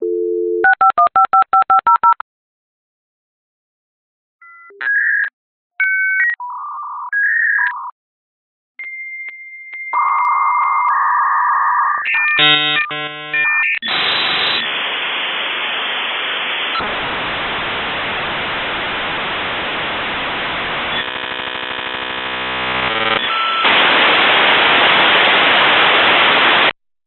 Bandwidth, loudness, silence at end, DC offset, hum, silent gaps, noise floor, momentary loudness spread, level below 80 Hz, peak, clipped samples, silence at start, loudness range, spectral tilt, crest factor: 4.5 kHz; -14 LUFS; 0.35 s; under 0.1%; none; 2.21-4.39 s, 5.33-5.70 s, 7.92-8.75 s; under -90 dBFS; 12 LU; -50 dBFS; 0 dBFS; under 0.1%; 0 s; 9 LU; 1.5 dB/octave; 16 dB